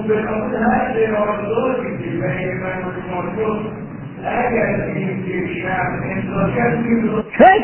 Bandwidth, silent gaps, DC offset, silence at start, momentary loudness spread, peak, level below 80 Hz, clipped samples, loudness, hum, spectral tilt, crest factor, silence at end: 3.2 kHz; none; under 0.1%; 0 s; 7 LU; 0 dBFS; -42 dBFS; under 0.1%; -19 LUFS; none; -11 dB/octave; 18 dB; 0 s